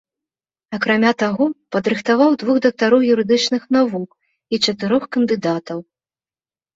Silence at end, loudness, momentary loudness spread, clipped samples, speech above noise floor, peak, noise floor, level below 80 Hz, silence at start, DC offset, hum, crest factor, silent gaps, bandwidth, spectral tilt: 0.95 s; -17 LUFS; 10 LU; under 0.1%; over 73 dB; -2 dBFS; under -90 dBFS; -62 dBFS; 0.7 s; under 0.1%; none; 16 dB; none; 8 kHz; -5 dB/octave